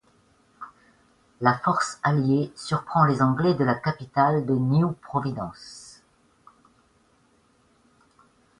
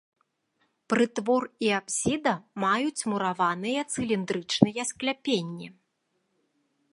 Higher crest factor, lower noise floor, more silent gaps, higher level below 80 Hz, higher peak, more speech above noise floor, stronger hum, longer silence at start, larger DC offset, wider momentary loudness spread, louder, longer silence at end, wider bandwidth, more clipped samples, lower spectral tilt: about the same, 24 dB vs 26 dB; second, -63 dBFS vs -76 dBFS; neither; about the same, -60 dBFS vs -62 dBFS; about the same, -2 dBFS vs -2 dBFS; second, 39 dB vs 49 dB; neither; second, 0.6 s vs 0.9 s; neither; first, 20 LU vs 5 LU; first, -24 LUFS vs -27 LUFS; first, 2.7 s vs 1.2 s; about the same, 11 kHz vs 11.5 kHz; neither; first, -7 dB/octave vs -4 dB/octave